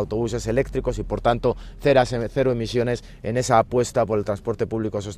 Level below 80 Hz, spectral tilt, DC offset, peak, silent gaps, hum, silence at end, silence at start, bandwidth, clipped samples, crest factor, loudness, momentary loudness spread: -38 dBFS; -6 dB/octave; under 0.1%; -4 dBFS; none; none; 0 s; 0 s; 13.5 kHz; under 0.1%; 18 dB; -23 LUFS; 8 LU